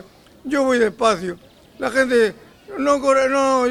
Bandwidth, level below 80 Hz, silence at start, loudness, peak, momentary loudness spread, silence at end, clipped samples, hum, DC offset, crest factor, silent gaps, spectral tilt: 13.5 kHz; -54 dBFS; 0.45 s; -18 LUFS; -4 dBFS; 14 LU; 0 s; under 0.1%; none; under 0.1%; 16 dB; none; -4 dB/octave